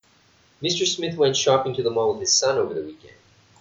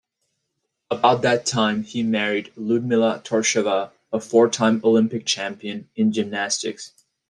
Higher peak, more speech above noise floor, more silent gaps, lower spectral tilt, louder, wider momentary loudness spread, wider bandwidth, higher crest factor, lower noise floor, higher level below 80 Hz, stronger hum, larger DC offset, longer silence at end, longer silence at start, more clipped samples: second, -6 dBFS vs -2 dBFS; second, 36 dB vs 57 dB; neither; second, -2.5 dB/octave vs -4 dB/octave; about the same, -21 LUFS vs -21 LUFS; about the same, 10 LU vs 11 LU; second, 8 kHz vs 11 kHz; about the same, 18 dB vs 18 dB; second, -58 dBFS vs -77 dBFS; about the same, -64 dBFS vs -66 dBFS; neither; neither; about the same, 0.5 s vs 0.4 s; second, 0.6 s vs 0.9 s; neither